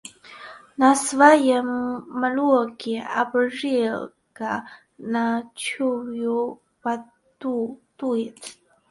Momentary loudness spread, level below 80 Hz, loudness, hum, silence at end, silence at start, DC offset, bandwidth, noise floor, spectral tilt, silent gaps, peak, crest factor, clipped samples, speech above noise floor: 19 LU; -70 dBFS; -23 LUFS; none; 0.4 s; 0.05 s; under 0.1%; 11.5 kHz; -43 dBFS; -3.5 dB/octave; none; -2 dBFS; 22 dB; under 0.1%; 21 dB